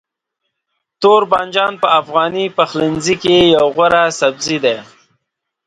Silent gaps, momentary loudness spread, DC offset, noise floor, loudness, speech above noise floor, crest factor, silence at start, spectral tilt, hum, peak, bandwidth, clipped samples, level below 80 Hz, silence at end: none; 6 LU; under 0.1%; -75 dBFS; -13 LUFS; 62 dB; 14 dB; 1 s; -4 dB/octave; none; 0 dBFS; 10.5 kHz; under 0.1%; -50 dBFS; 0.85 s